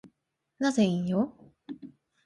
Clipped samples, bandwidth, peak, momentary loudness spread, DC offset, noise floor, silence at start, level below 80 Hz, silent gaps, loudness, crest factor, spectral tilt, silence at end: under 0.1%; 11.5 kHz; -14 dBFS; 19 LU; under 0.1%; -79 dBFS; 0.05 s; -68 dBFS; none; -28 LUFS; 16 dB; -6 dB/octave; 0.35 s